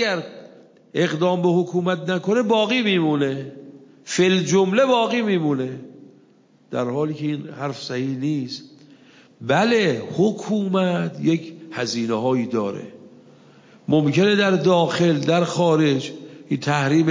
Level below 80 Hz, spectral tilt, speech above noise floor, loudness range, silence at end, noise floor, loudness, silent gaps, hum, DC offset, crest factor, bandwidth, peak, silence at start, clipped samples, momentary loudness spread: -70 dBFS; -5.5 dB/octave; 35 dB; 6 LU; 0 s; -55 dBFS; -21 LUFS; none; none; under 0.1%; 16 dB; 7.6 kHz; -6 dBFS; 0 s; under 0.1%; 13 LU